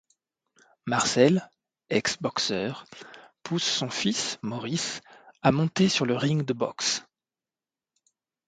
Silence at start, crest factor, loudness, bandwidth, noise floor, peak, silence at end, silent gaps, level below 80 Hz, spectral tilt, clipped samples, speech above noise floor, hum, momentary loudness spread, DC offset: 0.85 s; 22 dB; -26 LUFS; 9.6 kHz; under -90 dBFS; -6 dBFS; 1.45 s; none; -64 dBFS; -4 dB/octave; under 0.1%; over 64 dB; none; 16 LU; under 0.1%